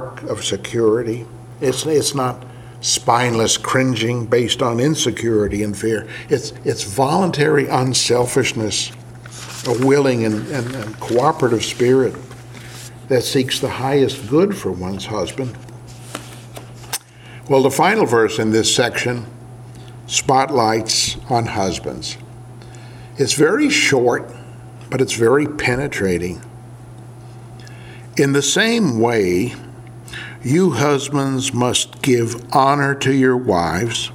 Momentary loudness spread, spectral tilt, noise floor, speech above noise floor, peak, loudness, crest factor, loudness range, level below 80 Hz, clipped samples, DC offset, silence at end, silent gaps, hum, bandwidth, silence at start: 22 LU; -4 dB/octave; -38 dBFS; 21 dB; 0 dBFS; -17 LUFS; 18 dB; 4 LU; -48 dBFS; under 0.1%; under 0.1%; 0 s; none; none; 17 kHz; 0 s